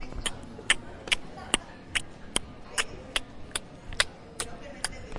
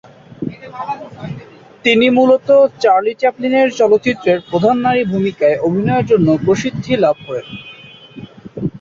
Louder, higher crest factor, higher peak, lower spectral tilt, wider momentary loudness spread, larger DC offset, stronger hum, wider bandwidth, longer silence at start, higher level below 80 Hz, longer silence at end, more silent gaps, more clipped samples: second, -31 LUFS vs -14 LUFS; first, 30 dB vs 14 dB; about the same, -4 dBFS vs -2 dBFS; second, -1 dB/octave vs -6.5 dB/octave; second, 9 LU vs 19 LU; neither; neither; first, 11.5 kHz vs 7.4 kHz; second, 0 s vs 0.4 s; about the same, -46 dBFS vs -50 dBFS; about the same, 0 s vs 0.05 s; neither; neither